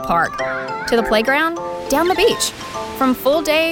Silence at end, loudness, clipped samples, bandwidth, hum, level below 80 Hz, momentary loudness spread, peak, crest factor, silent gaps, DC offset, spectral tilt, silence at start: 0 s; -17 LUFS; under 0.1%; 19 kHz; none; -42 dBFS; 8 LU; -6 dBFS; 12 dB; none; under 0.1%; -3 dB/octave; 0 s